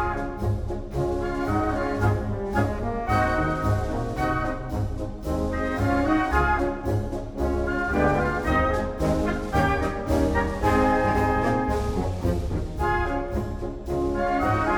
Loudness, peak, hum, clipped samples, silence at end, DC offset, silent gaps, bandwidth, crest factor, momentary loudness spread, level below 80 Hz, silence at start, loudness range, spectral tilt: -25 LUFS; -8 dBFS; none; under 0.1%; 0 s; under 0.1%; none; 19.5 kHz; 16 dB; 7 LU; -32 dBFS; 0 s; 3 LU; -7 dB/octave